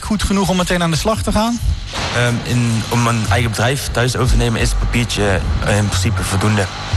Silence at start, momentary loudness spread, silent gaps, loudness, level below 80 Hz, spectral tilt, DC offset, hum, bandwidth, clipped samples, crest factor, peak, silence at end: 0 s; 2 LU; none; -16 LUFS; -24 dBFS; -5 dB/octave; under 0.1%; none; 13 kHz; under 0.1%; 10 dB; -6 dBFS; 0 s